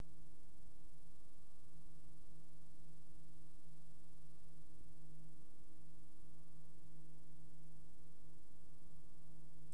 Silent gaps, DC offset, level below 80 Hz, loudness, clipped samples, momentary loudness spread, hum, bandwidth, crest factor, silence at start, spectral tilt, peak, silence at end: none; 1%; -70 dBFS; -67 LUFS; under 0.1%; 3 LU; none; 11 kHz; 26 dB; 0 s; -6 dB/octave; -36 dBFS; 0 s